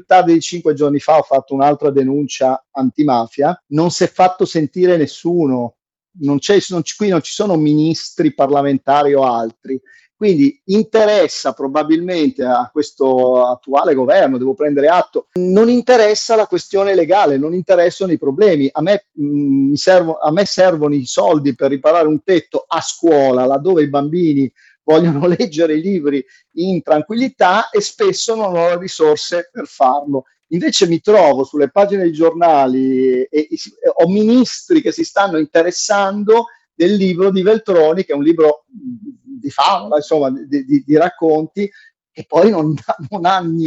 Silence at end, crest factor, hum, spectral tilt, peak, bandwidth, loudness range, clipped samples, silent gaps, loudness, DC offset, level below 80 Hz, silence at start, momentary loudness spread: 0 s; 14 dB; none; -5.5 dB/octave; 0 dBFS; 8.2 kHz; 3 LU; under 0.1%; none; -14 LUFS; under 0.1%; -64 dBFS; 0.1 s; 8 LU